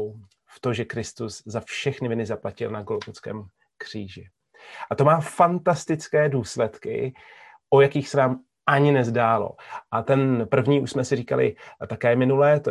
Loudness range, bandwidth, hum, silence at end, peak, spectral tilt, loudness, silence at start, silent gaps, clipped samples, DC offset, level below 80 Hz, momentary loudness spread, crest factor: 9 LU; 12 kHz; none; 0 s; -4 dBFS; -6.5 dB/octave; -23 LUFS; 0 s; none; under 0.1%; under 0.1%; -58 dBFS; 16 LU; 20 dB